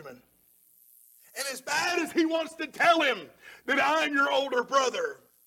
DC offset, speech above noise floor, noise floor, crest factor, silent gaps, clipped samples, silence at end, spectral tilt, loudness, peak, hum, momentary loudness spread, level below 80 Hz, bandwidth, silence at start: under 0.1%; 36 dB; -63 dBFS; 18 dB; none; under 0.1%; 0.3 s; -2 dB/octave; -27 LUFS; -10 dBFS; none; 12 LU; -76 dBFS; 17.5 kHz; 0 s